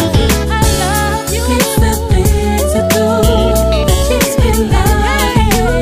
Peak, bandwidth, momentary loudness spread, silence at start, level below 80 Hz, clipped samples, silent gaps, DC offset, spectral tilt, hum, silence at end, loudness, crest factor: 0 dBFS; 15.5 kHz; 2 LU; 0 s; -16 dBFS; under 0.1%; none; 0.8%; -5 dB/octave; none; 0 s; -12 LUFS; 10 dB